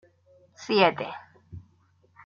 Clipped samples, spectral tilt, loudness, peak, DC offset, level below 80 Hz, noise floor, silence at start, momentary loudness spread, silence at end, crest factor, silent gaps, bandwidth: under 0.1%; -5 dB/octave; -24 LUFS; -6 dBFS; under 0.1%; -64 dBFS; -64 dBFS; 0.6 s; 26 LU; 0.65 s; 24 dB; none; 7.2 kHz